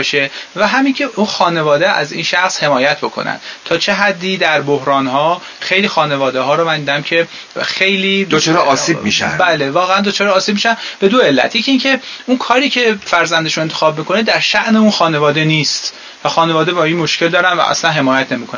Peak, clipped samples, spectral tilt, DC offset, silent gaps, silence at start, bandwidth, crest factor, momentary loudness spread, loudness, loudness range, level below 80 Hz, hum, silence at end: 0 dBFS; under 0.1%; -4 dB/octave; under 0.1%; none; 0 s; 7.4 kHz; 14 dB; 5 LU; -13 LUFS; 2 LU; -56 dBFS; none; 0 s